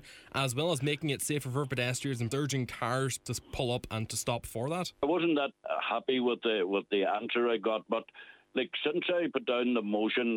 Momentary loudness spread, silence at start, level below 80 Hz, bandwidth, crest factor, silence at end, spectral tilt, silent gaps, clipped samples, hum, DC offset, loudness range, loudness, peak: 5 LU; 0.05 s; -60 dBFS; 19 kHz; 16 dB; 0 s; -4.5 dB/octave; none; under 0.1%; none; under 0.1%; 3 LU; -32 LUFS; -16 dBFS